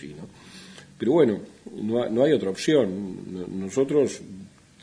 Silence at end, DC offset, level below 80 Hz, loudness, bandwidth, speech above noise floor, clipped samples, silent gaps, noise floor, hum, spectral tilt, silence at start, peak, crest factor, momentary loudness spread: 0.35 s; under 0.1%; -64 dBFS; -24 LUFS; 10.5 kHz; 22 dB; under 0.1%; none; -46 dBFS; none; -6 dB/octave; 0 s; -6 dBFS; 18 dB; 22 LU